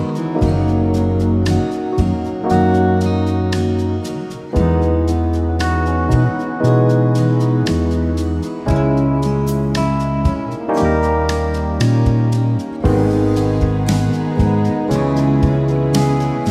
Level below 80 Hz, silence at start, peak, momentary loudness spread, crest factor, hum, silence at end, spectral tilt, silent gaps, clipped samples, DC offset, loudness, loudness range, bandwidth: -28 dBFS; 0 s; -2 dBFS; 5 LU; 14 dB; none; 0 s; -7.5 dB/octave; none; under 0.1%; under 0.1%; -17 LUFS; 2 LU; 14 kHz